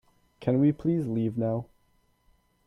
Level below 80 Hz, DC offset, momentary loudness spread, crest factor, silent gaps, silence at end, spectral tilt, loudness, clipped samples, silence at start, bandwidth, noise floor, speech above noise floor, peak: -60 dBFS; under 0.1%; 8 LU; 18 dB; none; 1 s; -10.5 dB/octave; -28 LUFS; under 0.1%; 0.4 s; 5.8 kHz; -68 dBFS; 42 dB; -12 dBFS